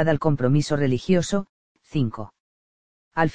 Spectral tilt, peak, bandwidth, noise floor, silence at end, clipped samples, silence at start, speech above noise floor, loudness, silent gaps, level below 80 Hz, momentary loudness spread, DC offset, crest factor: -6.5 dB/octave; -4 dBFS; 9.6 kHz; under -90 dBFS; 0 s; under 0.1%; 0 s; over 68 dB; -23 LUFS; 1.49-1.75 s, 2.40-3.11 s; -50 dBFS; 15 LU; under 0.1%; 18 dB